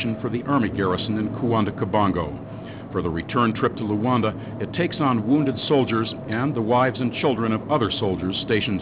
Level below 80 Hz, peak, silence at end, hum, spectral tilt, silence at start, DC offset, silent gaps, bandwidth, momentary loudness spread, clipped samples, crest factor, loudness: -46 dBFS; -6 dBFS; 0 s; none; -11 dB/octave; 0 s; under 0.1%; none; 4 kHz; 7 LU; under 0.1%; 16 dB; -23 LUFS